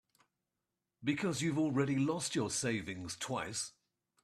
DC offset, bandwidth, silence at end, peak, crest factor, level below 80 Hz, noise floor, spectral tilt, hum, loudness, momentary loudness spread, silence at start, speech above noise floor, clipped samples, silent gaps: under 0.1%; 13.5 kHz; 0.55 s; -22 dBFS; 16 dB; -72 dBFS; -89 dBFS; -4.5 dB/octave; none; -36 LUFS; 8 LU; 1 s; 53 dB; under 0.1%; none